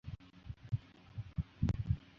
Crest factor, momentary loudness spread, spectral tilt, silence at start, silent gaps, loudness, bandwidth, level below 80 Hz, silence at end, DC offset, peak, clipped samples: 20 dB; 15 LU; -9 dB/octave; 0.05 s; none; -41 LUFS; 7.2 kHz; -48 dBFS; 0.15 s; under 0.1%; -20 dBFS; under 0.1%